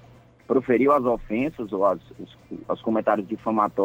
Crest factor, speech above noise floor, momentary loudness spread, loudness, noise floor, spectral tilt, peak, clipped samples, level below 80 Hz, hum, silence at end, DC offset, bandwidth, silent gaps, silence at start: 16 dB; 27 dB; 18 LU; -24 LUFS; -50 dBFS; -8.5 dB/octave; -8 dBFS; under 0.1%; -52 dBFS; none; 0 s; under 0.1%; 16 kHz; none; 0.5 s